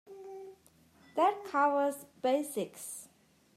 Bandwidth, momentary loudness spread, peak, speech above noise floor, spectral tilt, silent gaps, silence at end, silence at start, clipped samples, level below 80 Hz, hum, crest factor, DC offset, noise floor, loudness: 14.5 kHz; 19 LU; -16 dBFS; 32 dB; -3.5 dB/octave; none; 0.5 s; 0.1 s; under 0.1%; -84 dBFS; none; 20 dB; under 0.1%; -64 dBFS; -32 LUFS